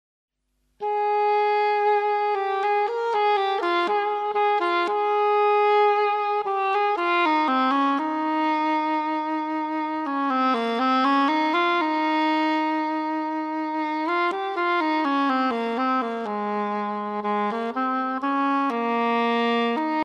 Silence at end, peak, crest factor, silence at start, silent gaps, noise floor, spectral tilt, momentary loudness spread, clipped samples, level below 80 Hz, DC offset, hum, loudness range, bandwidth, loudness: 0 s; -10 dBFS; 12 dB; 0.8 s; none; -71 dBFS; -5 dB/octave; 6 LU; under 0.1%; -70 dBFS; under 0.1%; none; 3 LU; 9.4 kHz; -23 LUFS